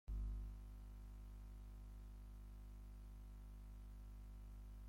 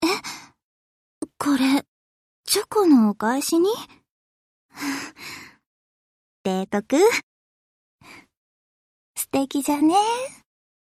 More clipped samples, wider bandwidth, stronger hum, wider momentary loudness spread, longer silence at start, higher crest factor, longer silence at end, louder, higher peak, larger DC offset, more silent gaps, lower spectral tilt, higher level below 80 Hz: neither; about the same, 16 kHz vs 15 kHz; first, 50 Hz at -55 dBFS vs none; second, 8 LU vs 19 LU; about the same, 0.05 s vs 0 s; about the same, 14 dB vs 18 dB; second, 0 s vs 0.5 s; second, -58 LUFS vs -22 LUFS; second, -38 dBFS vs -6 dBFS; neither; second, none vs 0.63-1.21 s, 1.88-2.44 s, 4.09-4.69 s, 5.66-6.44 s, 7.23-7.99 s, 8.37-9.14 s; first, -7 dB/octave vs -3.5 dB/octave; first, -54 dBFS vs -66 dBFS